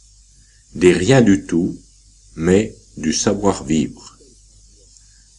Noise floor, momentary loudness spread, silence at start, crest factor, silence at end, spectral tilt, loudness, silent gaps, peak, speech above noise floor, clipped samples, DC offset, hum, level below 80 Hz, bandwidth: -50 dBFS; 14 LU; 0.75 s; 18 dB; 1.3 s; -5.5 dB/octave; -17 LUFS; none; -2 dBFS; 34 dB; under 0.1%; under 0.1%; none; -44 dBFS; 11 kHz